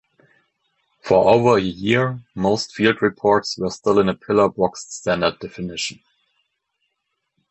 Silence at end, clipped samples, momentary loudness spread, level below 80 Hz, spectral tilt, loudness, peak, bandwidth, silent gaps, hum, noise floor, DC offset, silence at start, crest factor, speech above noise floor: 1.6 s; under 0.1%; 12 LU; -52 dBFS; -5 dB/octave; -19 LUFS; -2 dBFS; 8.4 kHz; none; none; -75 dBFS; under 0.1%; 1.05 s; 20 dB; 57 dB